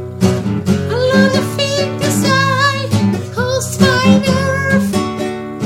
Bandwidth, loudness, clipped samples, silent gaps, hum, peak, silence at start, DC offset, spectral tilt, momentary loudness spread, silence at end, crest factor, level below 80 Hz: 16.5 kHz; -14 LUFS; under 0.1%; none; none; 0 dBFS; 0 s; under 0.1%; -5 dB/octave; 6 LU; 0 s; 14 dB; -44 dBFS